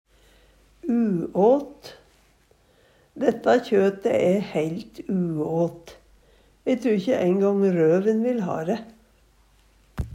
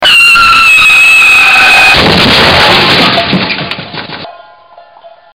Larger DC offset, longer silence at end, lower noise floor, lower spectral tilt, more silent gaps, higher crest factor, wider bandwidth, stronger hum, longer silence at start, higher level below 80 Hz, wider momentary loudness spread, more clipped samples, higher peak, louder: neither; second, 0 s vs 0.25 s; first, -60 dBFS vs -36 dBFS; first, -7.5 dB/octave vs -2.5 dB/octave; neither; first, 18 dB vs 6 dB; second, 13 kHz vs 20 kHz; neither; first, 0.85 s vs 0 s; second, -52 dBFS vs -32 dBFS; second, 12 LU vs 17 LU; second, under 0.1% vs 0.4%; second, -6 dBFS vs 0 dBFS; second, -23 LUFS vs -2 LUFS